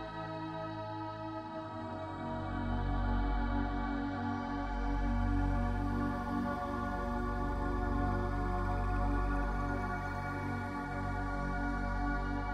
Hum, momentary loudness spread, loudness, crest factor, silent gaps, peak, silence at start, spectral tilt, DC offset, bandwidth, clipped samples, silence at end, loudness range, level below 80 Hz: none; 7 LU; -37 LUFS; 14 dB; none; -22 dBFS; 0 s; -8 dB/octave; under 0.1%; 8.4 kHz; under 0.1%; 0 s; 2 LU; -38 dBFS